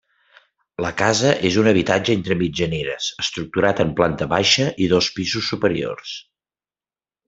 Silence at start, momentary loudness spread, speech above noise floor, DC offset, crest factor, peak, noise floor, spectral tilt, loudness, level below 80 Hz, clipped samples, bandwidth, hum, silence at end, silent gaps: 0.8 s; 10 LU; over 71 dB; under 0.1%; 20 dB; 0 dBFS; under -90 dBFS; -4.5 dB/octave; -19 LUFS; -50 dBFS; under 0.1%; 8 kHz; none; 1.05 s; none